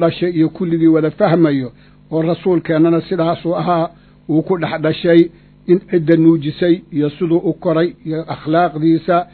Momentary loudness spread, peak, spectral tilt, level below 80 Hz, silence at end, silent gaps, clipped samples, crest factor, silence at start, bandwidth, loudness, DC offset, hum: 7 LU; 0 dBFS; -11 dB/octave; -50 dBFS; 0.1 s; none; under 0.1%; 14 dB; 0 s; 4.5 kHz; -15 LUFS; under 0.1%; none